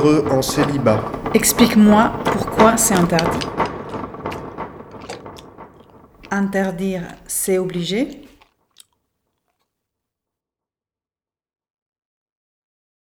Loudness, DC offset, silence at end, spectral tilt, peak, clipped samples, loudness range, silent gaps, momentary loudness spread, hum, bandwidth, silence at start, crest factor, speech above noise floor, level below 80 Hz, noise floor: -17 LUFS; under 0.1%; 4.75 s; -4.5 dB/octave; 0 dBFS; under 0.1%; 12 LU; none; 20 LU; none; 19.5 kHz; 0 s; 20 dB; over 74 dB; -44 dBFS; under -90 dBFS